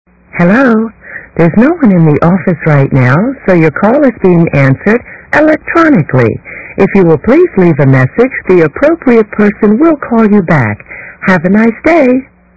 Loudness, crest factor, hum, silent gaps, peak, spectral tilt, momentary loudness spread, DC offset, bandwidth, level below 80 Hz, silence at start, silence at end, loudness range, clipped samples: -8 LUFS; 8 dB; none; none; 0 dBFS; -9.5 dB/octave; 6 LU; 1%; 8 kHz; -38 dBFS; 0.35 s; 0.3 s; 1 LU; 3%